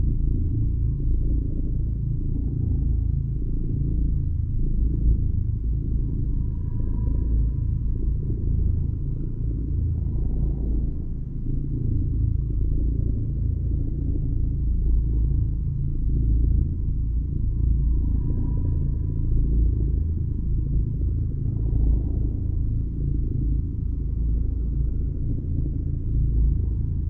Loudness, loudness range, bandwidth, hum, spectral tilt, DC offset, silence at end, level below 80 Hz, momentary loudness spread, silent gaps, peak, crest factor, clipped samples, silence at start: -26 LUFS; 2 LU; 1.1 kHz; none; -14 dB/octave; under 0.1%; 0 s; -24 dBFS; 4 LU; none; -10 dBFS; 12 dB; under 0.1%; 0 s